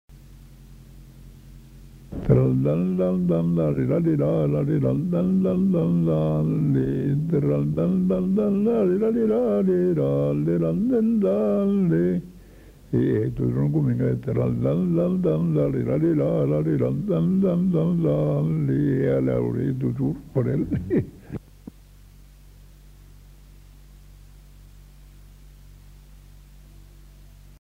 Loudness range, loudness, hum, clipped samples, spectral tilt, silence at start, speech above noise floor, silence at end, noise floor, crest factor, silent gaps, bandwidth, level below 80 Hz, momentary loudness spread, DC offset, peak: 4 LU; -22 LUFS; none; under 0.1%; -10.5 dB/octave; 0.1 s; 27 dB; 1 s; -48 dBFS; 16 dB; none; 7 kHz; -46 dBFS; 4 LU; under 0.1%; -6 dBFS